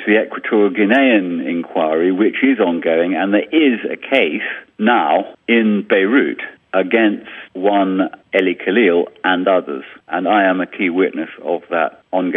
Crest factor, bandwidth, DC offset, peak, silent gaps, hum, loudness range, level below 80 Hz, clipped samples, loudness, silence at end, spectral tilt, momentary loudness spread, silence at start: 16 dB; 3.9 kHz; under 0.1%; 0 dBFS; none; none; 2 LU; -68 dBFS; under 0.1%; -16 LUFS; 0 s; -8 dB/octave; 8 LU; 0 s